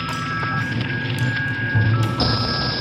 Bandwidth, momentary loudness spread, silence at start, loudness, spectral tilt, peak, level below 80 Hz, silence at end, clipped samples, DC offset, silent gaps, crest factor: 12.5 kHz; 4 LU; 0 s; -21 LUFS; -6 dB/octave; -8 dBFS; -40 dBFS; 0 s; under 0.1%; under 0.1%; none; 14 dB